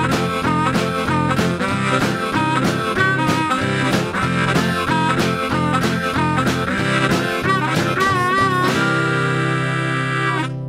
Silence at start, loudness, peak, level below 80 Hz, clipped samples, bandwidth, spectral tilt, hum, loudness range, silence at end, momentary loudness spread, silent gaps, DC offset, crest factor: 0 s; -18 LUFS; -4 dBFS; -44 dBFS; under 0.1%; 16 kHz; -5.5 dB/octave; none; 1 LU; 0 s; 3 LU; none; under 0.1%; 14 dB